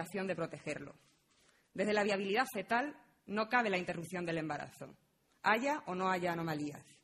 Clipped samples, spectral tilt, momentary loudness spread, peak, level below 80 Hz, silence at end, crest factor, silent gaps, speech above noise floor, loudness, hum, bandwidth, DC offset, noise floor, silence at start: under 0.1%; -5 dB/octave; 13 LU; -16 dBFS; -76 dBFS; 0.2 s; 20 dB; none; 34 dB; -36 LUFS; none; 13 kHz; under 0.1%; -71 dBFS; 0 s